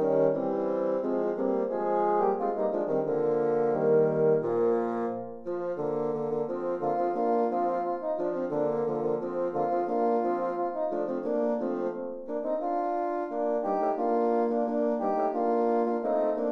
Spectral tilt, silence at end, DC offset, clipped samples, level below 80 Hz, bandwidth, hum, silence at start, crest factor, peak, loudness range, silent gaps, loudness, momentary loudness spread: -9.5 dB/octave; 0 s; 0.2%; under 0.1%; -70 dBFS; 6 kHz; none; 0 s; 16 dB; -12 dBFS; 3 LU; none; -28 LUFS; 6 LU